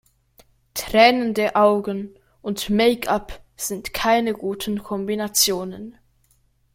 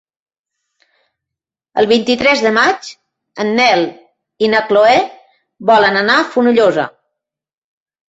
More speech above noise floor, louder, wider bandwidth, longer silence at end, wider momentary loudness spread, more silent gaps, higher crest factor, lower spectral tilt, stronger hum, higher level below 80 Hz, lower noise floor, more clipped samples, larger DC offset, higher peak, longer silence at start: second, 42 dB vs 75 dB; second, -20 LUFS vs -13 LUFS; first, 16.5 kHz vs 8 kHz; second, 0.85 s vs 1.2 s; first, 17 LU vs 12 LU; neither; first, 20 dB vs 14 dB; about the same, -3 dB/octave vs -4 dB/octave; neither; first, -50 dBFS vs -56 dBFS; second, -62 dBFS vs -86 dBFS; neither; neither; about the same, 0 dBFS vs 0 dBFS; second, 0.75 s vs 1.75 s